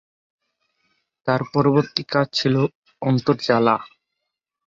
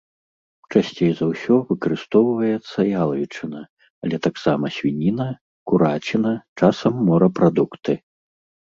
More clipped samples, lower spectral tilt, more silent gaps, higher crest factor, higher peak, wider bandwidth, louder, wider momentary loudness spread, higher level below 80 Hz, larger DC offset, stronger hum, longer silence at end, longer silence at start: neither; second, -6.5 dB/octave vs -8 dB/octave; second, 2.75-2.82 s vs 3.69-3.77 s, 3.90-4.02 s, 5.41-5.66 s, 6.48-6.56 s; about the same, 20 dB vs 18 dB; about the same, -4 dBFS vs -2 dBFS; about the same, 7.6 kHz vs 7.4 kHz; about the same, -20 LUFS vs -20 LUFS; second, 7 LU vs 10 LU; about the same, -62 dBFS vs -58 dBFS; neither; neither; about the same, 0.8 s vs 0.75 s; first, 1.25 s vs 0.7 s